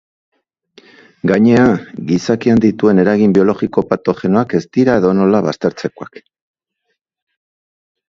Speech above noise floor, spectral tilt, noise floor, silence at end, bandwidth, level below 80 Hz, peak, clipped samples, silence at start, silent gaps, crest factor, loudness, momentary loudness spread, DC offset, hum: 59 dB; -7.5 dB/octave; -71 dBFS; 2.05 s; 7.6 kHz; -50 dBFS; 0 dBFS; under 0.1%; 1.25 s; none; 14 dB; -13 LUFS; 9 LU; under 0.1%; none